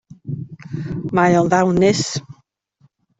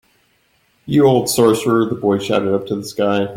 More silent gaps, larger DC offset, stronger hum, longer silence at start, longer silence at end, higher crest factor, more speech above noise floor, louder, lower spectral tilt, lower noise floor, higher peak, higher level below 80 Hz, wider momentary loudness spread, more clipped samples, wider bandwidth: neither; neither; neither; second, 0.25 s vs 0.85 s; first, 0.85 s vs 0 s; about the same, 16 dB vs 16 dB; about the same, 44 dB vs 44 dB; about the same, -17 LUFS vs -16 LUFS; about the same, -5.5 dB/octave vs -5.5 dB/octave; about the same, -60 dBFS vs -60 dBFS; about the same, -2 dBFS vs -2 dBFS; about the same, -52 dBFS vs -54 dBFS; first, 16 LU vs 6 LU; neither; second, 8 kHz vs 16.5 kHz